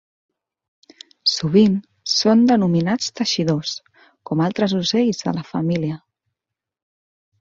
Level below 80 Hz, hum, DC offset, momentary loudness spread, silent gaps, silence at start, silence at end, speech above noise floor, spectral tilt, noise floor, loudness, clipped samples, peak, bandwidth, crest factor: -60 dBFS; none; under 0.1%; 10 LU; none; 1.25 s; 1.45 s; 67 dB; -5.5 dB/octave; -85 dBFS; -19 LUFS; under 0.1%; -2 dBFS; 7.6 kHz; 18 dB